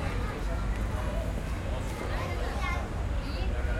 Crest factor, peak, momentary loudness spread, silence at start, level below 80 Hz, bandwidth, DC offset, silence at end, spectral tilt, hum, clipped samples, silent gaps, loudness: 12 dB; -18 dBFS; 2 LU; 0 s; -32 dBFS; 14.5 kHz; under 0.1%; 0 s; -6 dB/octave; none; under 0.1%; none; -33 LUFS